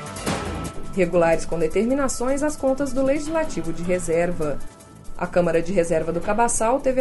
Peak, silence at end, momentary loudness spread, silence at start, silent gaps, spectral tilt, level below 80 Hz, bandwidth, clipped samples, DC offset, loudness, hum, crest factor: -6 dBFS; 0 s; 9 LU; 0 s; none; -5 dB/octave; -34 dBFS; 12 kHz; under 0.1%; under 0.1%; -23 LUFS; none; 16 dB